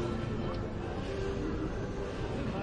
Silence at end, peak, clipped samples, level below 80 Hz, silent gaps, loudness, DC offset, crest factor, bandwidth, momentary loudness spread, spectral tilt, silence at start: 0 s; -22 dBFS; under 0.1%; -42 dBFS; none; -36 LUFS; under 0.1%; 12 dB; 10.5 kHz; 2 LU; -7 dB/octave; 0 s